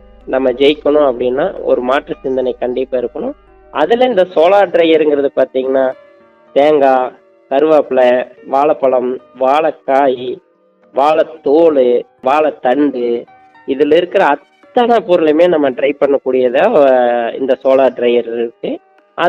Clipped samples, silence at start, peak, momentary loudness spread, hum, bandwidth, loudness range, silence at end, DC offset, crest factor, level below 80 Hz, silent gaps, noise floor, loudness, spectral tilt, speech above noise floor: under 0.1%; 0.25 s; 0 dBFS; 10 LU; none; 7.6 kHz; 3 LU; 0 s; under 0.1%; 12 dB; -50 dBFS; none; -44 dBFS; -13 LUFS; -6.5 dB/octave; 33 dB